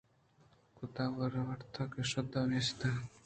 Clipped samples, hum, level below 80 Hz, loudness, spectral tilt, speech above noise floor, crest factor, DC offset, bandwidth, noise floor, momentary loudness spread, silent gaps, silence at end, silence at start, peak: under 0.1%; none; -64 dBFS; -37 LUFS; -5.5 dB/octave; 31 dB; 16 dB; under 0.1%; 9 kHz; -68 dBFS; 8 LU; none; 0.05 s; 0.75 s; -22 dBFS